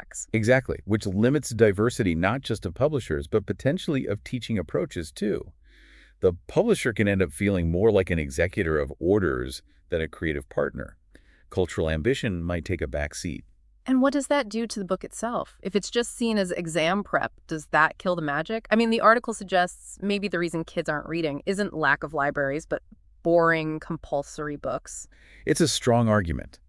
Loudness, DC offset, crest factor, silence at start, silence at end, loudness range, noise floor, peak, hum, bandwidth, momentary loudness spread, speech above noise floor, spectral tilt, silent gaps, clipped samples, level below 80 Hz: -26 LUFS; under 0.1%; 22 dB; 0 s; 0.1 s; 5 LU; -56 dBFS; -4 dBFS; none; 12 kHz; 10 LU; 30 dB; -5.5 dB/octave; none; under 0.1%; -46 dBFS